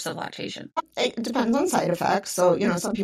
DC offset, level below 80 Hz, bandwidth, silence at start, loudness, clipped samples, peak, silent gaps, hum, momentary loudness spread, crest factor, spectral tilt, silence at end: under 0.1%; -62 dBFS; 16 kHz; 0 s; -24 LUFS; under 0.1%; -8 dBFS; none; none; 11 LU; 16 dB; -4.5 dB/octave; 0 s